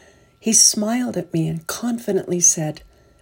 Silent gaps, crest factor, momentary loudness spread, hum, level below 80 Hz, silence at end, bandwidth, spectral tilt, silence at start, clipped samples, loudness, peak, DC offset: none; 20 dB; 13 LU; none; -58 dBFS; 0.45 s; 16.5 kHz; -2.5 dB/octave; 0.45 s; under 0.1%; -18 LUFS; 0 dBFS; under 0.1%